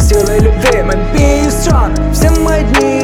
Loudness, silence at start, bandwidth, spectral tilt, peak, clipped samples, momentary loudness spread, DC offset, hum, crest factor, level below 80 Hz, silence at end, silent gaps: -11 LUFS; 0 s; 17.5 kHz; -5.5 dB/octave; 0 dBFS; under 0.1%; 2 LU; under 0.1%; none; 10 dB; -14 dBFS; 0 s; none